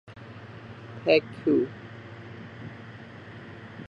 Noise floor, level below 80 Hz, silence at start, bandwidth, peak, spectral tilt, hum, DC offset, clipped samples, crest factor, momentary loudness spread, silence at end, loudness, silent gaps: -44 dBFS; -62 dBFS; 0.1 s; 7.4 kHz; -6 dBFS; -7.5 dB/octave; none; under 0.1%; under 0.1%; 24 dB; 21 LU; 0 s; -25 LUFS; none